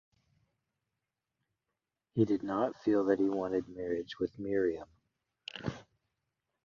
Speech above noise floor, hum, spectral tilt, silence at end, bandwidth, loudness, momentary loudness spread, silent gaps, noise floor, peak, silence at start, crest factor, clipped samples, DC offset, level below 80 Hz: 56 dB; none; -7.5 dB/octave; 0.85 s; 7.2 kHz; -33 LUFS; 13 LU; none; -88 dBFS; -16 dBFS; 2.15 s; 20 dB; under 0.1%; under 0.1%; -66 dBFS